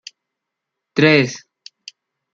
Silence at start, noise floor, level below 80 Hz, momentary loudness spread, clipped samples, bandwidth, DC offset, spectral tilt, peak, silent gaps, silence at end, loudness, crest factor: 0.95 s; -81 dBFS; -64 dBFS; 25 LU; under 0.1%; 7.6 kHz; under 0.1%; -5.5 dB/octave; -2 dBFS; none; 0.95 s; -15 LUFS; 20 dB